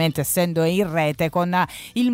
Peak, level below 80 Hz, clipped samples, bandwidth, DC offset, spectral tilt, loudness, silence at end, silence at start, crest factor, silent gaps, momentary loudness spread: -8 dBFS; -52 dBFS; under 0.1%; 16.5 kHz; under 0.1%; -5 dB/octave; -21 LUFS; 0 s; 0 s; 12 dB; none; 3 LU